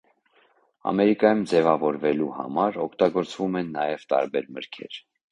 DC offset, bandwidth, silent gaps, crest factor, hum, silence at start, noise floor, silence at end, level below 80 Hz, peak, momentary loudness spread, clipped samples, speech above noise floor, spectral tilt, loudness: under 0.1%; 10.5 kHz; none; 20 dB; none; 0.85 s; -63 dBFS; 0.3 s; -66 dBFS; -4 dBFS; 16 LU; under 0.1%; 39 dB; -6.5 dB/octave; -24 LUFS